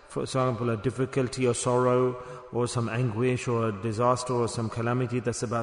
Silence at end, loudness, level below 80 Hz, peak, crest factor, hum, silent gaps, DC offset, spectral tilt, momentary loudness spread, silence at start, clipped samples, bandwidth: 0 s; -27 LUFS; -58 dBFS; -12 dBFS; 16 dB; none; none; under 0.1%; -6 dB/octave; 5 LU; 0.05 s; under 0.1%; 10.5 kHz